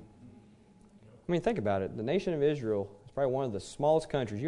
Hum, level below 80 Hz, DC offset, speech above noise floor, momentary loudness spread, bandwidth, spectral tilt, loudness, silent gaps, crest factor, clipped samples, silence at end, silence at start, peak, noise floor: none; -60 dBFS; under 0.1%; 28 dB; 7 LU; 11 kHz; -7 dB/octave; -32 LUFS; none; 16 dB; under 0.1%; 0 s; 0 s; -16 dBFS; -59 dBFS